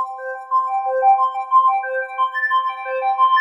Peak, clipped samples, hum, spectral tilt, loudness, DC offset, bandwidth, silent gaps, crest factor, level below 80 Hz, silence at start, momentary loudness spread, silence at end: -6 dBFS; under 0.1%; none; 1 dB/octave; -18 LUFS; under 0.1%; 7.4 kHz; none; 12 dB; under -90 dBFS; 0 s; 8 LU; 0 s